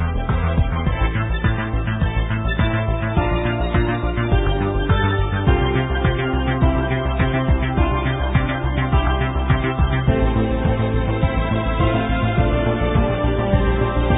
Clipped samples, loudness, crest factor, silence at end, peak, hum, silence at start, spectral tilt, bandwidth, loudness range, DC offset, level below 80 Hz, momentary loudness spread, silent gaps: under 0.1%; -20 LUFS; 16 dB; 0 s; -2 dBFS; none; 0 s; -12.5 dB/octave; 4 kHz; 1 LU; under 0.1%; -22 dBFS; 3 LU; none